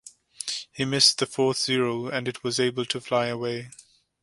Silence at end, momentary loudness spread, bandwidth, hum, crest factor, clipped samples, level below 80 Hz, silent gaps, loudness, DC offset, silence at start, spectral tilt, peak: 0.4 s; 13 LU; 11.5 kHz; none; 22 dB; under 0.1%; -66 dBFS; none; -25 LUFS; under 0.1%; 0.05 s; -3 dB/octave; -4 dBFS